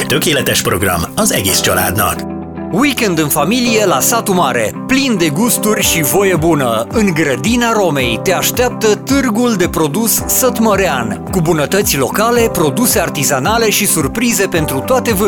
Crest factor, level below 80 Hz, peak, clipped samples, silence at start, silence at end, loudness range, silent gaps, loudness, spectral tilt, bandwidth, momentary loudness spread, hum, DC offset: 12 dB; -36 dBFS; 0 dBFS; under 0.1%; 0 s; 0 s; 1 LU; none; -12 LUFS; -3.5 dB/octave; 19.5 kHz; 3 LU; none; under 0.1%